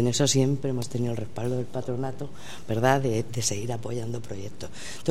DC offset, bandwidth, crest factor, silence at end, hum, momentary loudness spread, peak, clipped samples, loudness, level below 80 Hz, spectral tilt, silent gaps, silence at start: 2%; 15 kHz; 20 dB; 0 s; none; 16 LU; -8 dBFS; under 0.1%; -28 LUFS; -56 dBFS; -5 dB/octave; none; 0 s